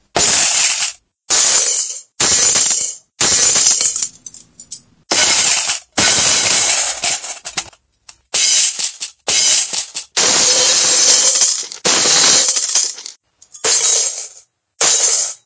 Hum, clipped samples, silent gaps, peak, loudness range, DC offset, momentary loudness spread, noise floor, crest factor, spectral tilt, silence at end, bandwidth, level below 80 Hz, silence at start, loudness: none; under 0.1%; none; 0 dBFS; 4 LU; under 0.1%; 12 LU; -46 dBFS; 16 dB; 1 dB/octave; 0.1 s; 8 kHz; -50 dBFS; 0.15 s; -11 LUFS